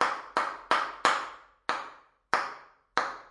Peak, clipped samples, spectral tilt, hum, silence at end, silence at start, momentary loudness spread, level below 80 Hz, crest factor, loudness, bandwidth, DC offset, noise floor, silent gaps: -4 dBFS; under 0.1%; -1.5 dB/octave; none; 0 s; 0 s; 13 LU; -70 dBFS; 26 dB; -30 LUFS; 11.5 kHz; under 0.1%; -51 dBFS; none